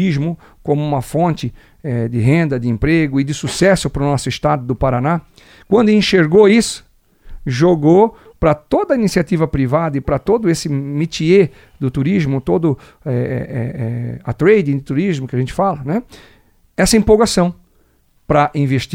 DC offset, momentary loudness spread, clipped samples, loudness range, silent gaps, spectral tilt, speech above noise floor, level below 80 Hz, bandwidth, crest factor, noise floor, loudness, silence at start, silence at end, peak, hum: under 0.1%; 11 LU; under 0.1%; 4 LU; none; -6 dB/octave; 40 dB; -36 dBFS; 16.5 kHz; 16 dB; -55 dBFS; -16 LUFS; 0 s; 0 s; 0 dBFS; none